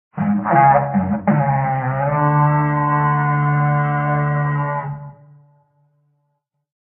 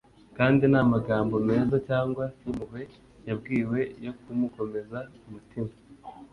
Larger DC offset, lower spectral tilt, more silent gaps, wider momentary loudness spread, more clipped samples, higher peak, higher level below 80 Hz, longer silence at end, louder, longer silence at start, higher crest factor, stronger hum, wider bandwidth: neither; first, -12.5 dB/octave vs -9.5 dB/octave; neither; second, 7 LU vs 22 LU; neither; first, -2 dBFS vs -8 dBFS; about the same, -50 dBFS vs -54 dBFS; first, 1.75 s vs 0.05 s; first, -17 LUFS vs -27 LUFS; second, 0.15 s vs 0.35 s; about the same, 16 dB vs 20 dB; neither; second, 3.2 kHz vs 6 kHz